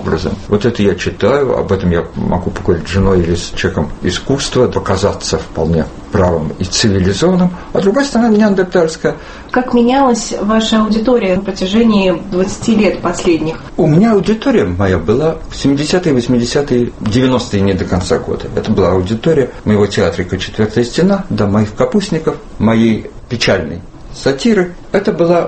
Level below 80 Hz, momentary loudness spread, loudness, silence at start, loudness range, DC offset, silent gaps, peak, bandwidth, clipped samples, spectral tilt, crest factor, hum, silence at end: -32 dBFS; 6 LU; -13 LUFS; 0 s; 2 LU; under 0.1%; none; 0 dBFS; 8.8 kHz; under 0.1%; -6 dB/octave; 12 dB; none; 0 s